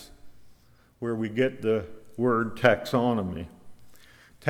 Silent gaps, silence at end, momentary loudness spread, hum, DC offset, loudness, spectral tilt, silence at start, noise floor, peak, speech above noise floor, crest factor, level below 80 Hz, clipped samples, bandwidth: none; 0 s; 14 LU; none; under 0.1%; -27 LUFS; -7 dB/octave; 0 s; -59 dBFS; -6 dBFS; 33 dB; 22 dB; -58 dBFS; under 0.1%; 16.5 kHz